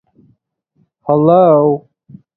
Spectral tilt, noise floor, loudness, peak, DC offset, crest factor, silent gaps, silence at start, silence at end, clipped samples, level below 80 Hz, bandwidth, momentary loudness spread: -12.5 dB/octave; -61 dBFS; -11 LUFS; 0 dBFS; under 0.1%; 14 dB; none; 1.05 s; 0.55 s; under 0.1%; -60 dBFS; 4.2 kHz; 14 LU